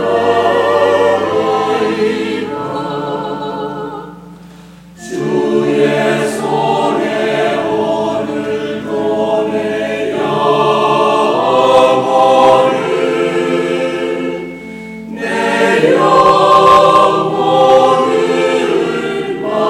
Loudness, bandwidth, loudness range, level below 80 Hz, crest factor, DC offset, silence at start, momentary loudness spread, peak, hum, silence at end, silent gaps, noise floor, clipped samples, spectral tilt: -12 LUFS; 14.5 kHz; 8 LU; -50 dBFS; 12 dB; under 0.1%; 0 s; 12 LU; 0 dBFS; none; 0 s; none; -36 dBFS; under 0.1%; -5 dB/octave